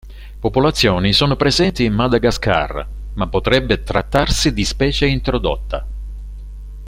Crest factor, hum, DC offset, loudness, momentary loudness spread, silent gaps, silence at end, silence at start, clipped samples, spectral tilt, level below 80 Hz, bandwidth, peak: 16 dB; 50 Hz at -30 dBFS; under 0.1%; -17 LUFS; 17 LU; none; 0 s; 0.05 s; under 0.1%; -5 dB/octave; -26 dBFS; 16 kHz; 0 dBFS